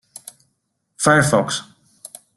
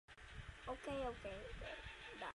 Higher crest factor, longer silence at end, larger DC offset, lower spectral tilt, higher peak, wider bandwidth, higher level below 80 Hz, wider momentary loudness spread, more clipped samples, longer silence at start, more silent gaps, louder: first, 20 dB vs 14 dB; first, 0.75 s vs 0 s; neither; about the same, -4 dB/octave vs -5 dB/octave; first, -2 dBFS vs -36 dBFS; about the same, 12.5 kHz vs 11.5 kHz; about the same, -56 dBFS vs -60 dBFS; first, 24 LU vs 10 LU; neither; first, 1 s vs 0.1 s; neither; first, -17 LUFS vs -50 LUFS